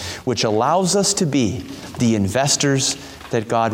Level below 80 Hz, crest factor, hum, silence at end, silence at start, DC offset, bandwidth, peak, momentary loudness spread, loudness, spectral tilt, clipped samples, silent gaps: -50 dBFS; 14 dB; none; 0 s; 0 s; under 0.1%; 16.5 kHz; -4 dBFS; 9 LU; -18 LUFS; -4 dB/octave; under 0.1%; none